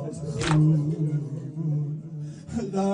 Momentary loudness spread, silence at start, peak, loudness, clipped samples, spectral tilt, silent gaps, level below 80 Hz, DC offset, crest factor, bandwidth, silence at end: 13 LU; 0 s; -10 dBFS; -26 LUFS; under 0.1%; -7 dB/octave; none; -52 dBFS; under 0.1%; 16 dB; 10 kHz; 0 s